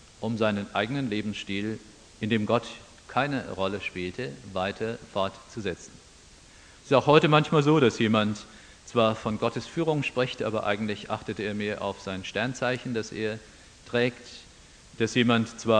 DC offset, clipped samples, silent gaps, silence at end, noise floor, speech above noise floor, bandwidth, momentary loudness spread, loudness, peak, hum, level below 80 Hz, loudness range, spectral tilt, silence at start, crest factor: under 0.1%; under 0.1%; none; 0 s; -52 dBFS; 26 dB; 10 kHz; 13 LU; -27 LUFS; -4 dBFS; none; -58 dBFS; 8 LU; -5.5 dB/octave; 0.2 s; 24 dB